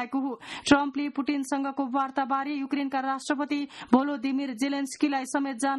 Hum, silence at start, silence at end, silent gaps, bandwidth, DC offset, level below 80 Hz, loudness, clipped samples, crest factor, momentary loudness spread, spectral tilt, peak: none; 0 s; 0 s; none; 12 kHz; under 0.1%; -64 dBFS; -28 LUFS; under 0.1%; 20 dB; 7 LU; -3.5 dB/octave; -6 dBFS